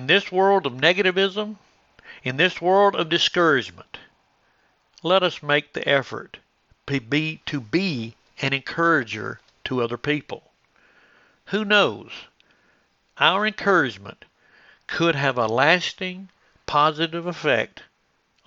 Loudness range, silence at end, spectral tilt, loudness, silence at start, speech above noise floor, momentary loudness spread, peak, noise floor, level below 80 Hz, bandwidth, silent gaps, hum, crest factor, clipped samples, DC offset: 5 LU; 0.65 s; -5 dB/octave; -21 LUFS; 0 s; 45 dB; 18 LU; 0 dBFS; -67 dBFS; -64 dBFS; 7.6 kHz; none; none; 24 dB; under 0.1%; under 0.1%